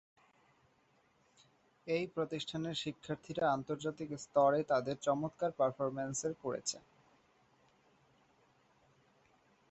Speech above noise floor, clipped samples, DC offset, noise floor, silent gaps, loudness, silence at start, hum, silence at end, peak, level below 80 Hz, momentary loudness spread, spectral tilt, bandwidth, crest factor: 36 dB; under 0.1%; under 0.1%; -72 dBFS; none; -37 LUFS; 1.85 s; none; 2.9 s; -18 dBFS; -76 dBFS; 10 LU; -4.5 dB/octave; 8 kHz; 20 dB